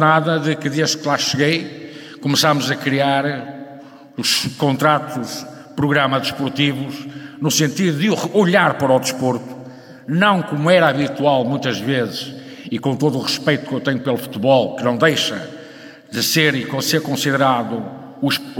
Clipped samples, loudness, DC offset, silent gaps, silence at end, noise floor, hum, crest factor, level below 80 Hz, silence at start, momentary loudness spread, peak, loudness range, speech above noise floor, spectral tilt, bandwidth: under 0.1%; -18 LUFS; under 0.1%; none; 0 s; -39 dBFS; none; 18 dB; -62 dBFS; 0 s; 16 LU; 0 dBFS; 2 LU; 22 dB; -4.5 dB/octave; 18 kHz